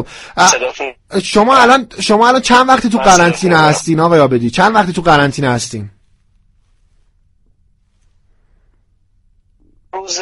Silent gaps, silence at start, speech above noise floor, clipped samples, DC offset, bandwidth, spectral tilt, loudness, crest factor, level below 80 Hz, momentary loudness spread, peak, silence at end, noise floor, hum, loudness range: none; 0 s; 44 dB; 0.2%; under 0.1%; 19 kHz; -4 dB/octave; -10 LUFS; 14 dB; -42 dBFS; 15 LU; 0 dBFS; 0 s; -55 dBFS; none; 10 LU